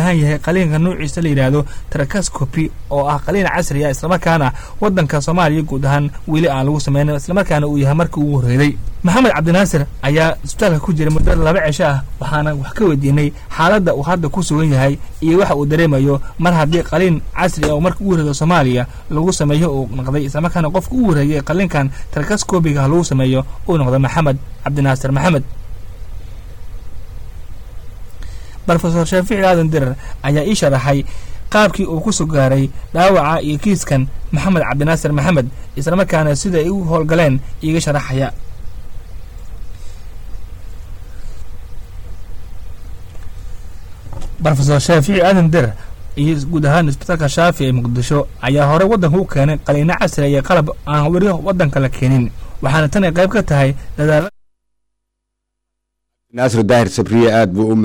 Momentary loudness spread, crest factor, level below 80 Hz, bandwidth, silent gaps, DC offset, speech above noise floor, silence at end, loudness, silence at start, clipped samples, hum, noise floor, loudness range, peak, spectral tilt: 22 LU; 10 dB; -28 dBFS; 18 kHz; none; under 0.1%; 62 dB; 0 s; -15 LUFS; 0 s; under 0.1%; none; -76 dBFS; 8 LU; -4 dBFS; -6.5 dB/octave